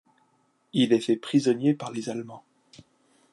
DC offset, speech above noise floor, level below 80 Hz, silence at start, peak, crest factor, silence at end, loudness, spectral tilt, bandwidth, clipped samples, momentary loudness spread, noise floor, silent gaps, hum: under 0.1%; 43 dB; -76 dBFS; 0.75 s; -8 dBFS; 18 dB; 0.95 s; -25 LUFS; -6 dB/octave; 11.5 kHz; under 0.1%; 12 LU; -68 dBFS; none; none